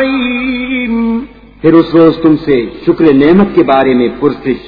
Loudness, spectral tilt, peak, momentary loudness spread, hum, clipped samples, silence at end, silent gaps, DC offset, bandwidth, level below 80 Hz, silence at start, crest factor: -10 LUFS; -9.5 dB/octave; 0 dBFS; 8 LU; none; 0.9%; 0 s; none; under 0.1%; 5 kHz; -38 dBFS; 0 s; 10 dB